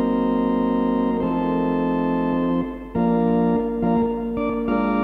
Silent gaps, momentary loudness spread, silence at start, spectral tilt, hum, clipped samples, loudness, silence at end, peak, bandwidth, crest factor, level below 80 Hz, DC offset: none; 4 LU; 0 s; -10 dB/octave; none; under 0.1%; -21 LUFS; 0 s; -8 dBFS; 4.5 kHz; 12 dB; -42 dBFS; under 0.1%